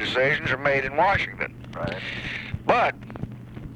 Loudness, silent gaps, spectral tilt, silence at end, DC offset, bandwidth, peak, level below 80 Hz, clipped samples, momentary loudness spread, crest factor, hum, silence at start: -24 LUFS; none; -5.5 dB/octave; 0 s; under 0.1%; 11.5 kHz; -6 dBFS; -46 dBFS; under 0.1%; 15 LU; 20 dB; none; 0 s